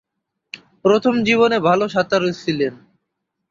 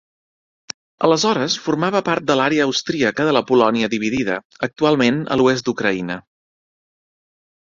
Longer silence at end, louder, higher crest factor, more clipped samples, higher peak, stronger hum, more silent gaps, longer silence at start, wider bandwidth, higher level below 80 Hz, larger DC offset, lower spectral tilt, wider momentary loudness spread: second, 0.75 s vs 1.55 s; about the same, -17 LUFS vs -18 LUFS; about the same, 16 dB vs 20 dB; neither; second, -4 dBFS vs 0 dBFS; neither; second, none vs 4.45-4.50 s; second, 0.55 s vs 1 s; about the same, 7.6 kHz vs 7.6 kHz; about the same, -60 dBFS vs -58 dBFS; neither; about the same, -5.5 dB/octave vs -4.5 dB/octave; first, 17 LU vs 10 LU